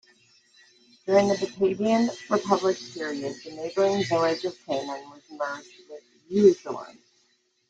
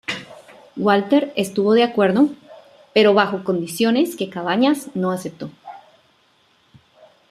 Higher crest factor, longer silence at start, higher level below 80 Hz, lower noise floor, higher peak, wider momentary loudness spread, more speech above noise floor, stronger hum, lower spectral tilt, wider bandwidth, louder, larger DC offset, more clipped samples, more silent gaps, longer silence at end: about the same, 20 dB vs 18 dB; first, 1.05 s vs 0.1 s; about the same, -68 dBFS vs -66 dBFS; first, -68 dBFS vs -59 dBFS; second, -6 dBFS vs -2 dBFS; about the same, 19 LU vs 17 LU; about the same, 43 dB vs 41 dB; neither; about the same, -5.5 dB/octave vs -5.5 dB/octave; second, 9 kHz vs 14.5 kHz; second, -25 LUFS vs -18 LUFS; neither; neither; neither; second, 0.8 s vs 1.5 s